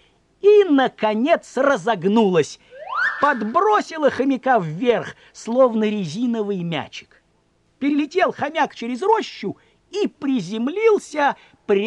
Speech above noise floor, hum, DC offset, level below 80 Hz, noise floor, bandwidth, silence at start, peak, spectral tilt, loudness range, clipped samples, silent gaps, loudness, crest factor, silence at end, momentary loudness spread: 42 dB; none; under 0.1%; -66 dBFS; -62 dBFS; 10 kHz; 0.45 s; -4 dBFS; -5.5 dB/octave; 5 LU; under 0.1%; none; -20 LUFS; 16 dB; 0 s; 11 LU